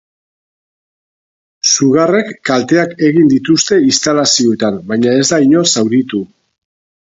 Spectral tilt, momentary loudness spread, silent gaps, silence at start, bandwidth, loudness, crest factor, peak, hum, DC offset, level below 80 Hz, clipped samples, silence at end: -3.5 dB/octave; 6 LU; none; 1.65 s; 8 kHz; -11 LUFS; 12 dB; 0 dBFS; none; under 0.1%; -56 dBFS; under 0.1%; 0.95 s